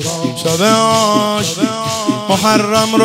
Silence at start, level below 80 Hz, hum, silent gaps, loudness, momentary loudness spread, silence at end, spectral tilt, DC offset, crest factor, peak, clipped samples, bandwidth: 0 s; -54 dBFS; none; none; -13 LUFS; 6 LU; 0 s; -4 dB/octave; under 0.1%; 14 dB; 0 dBFS; under 0.1%; 16.5 kHz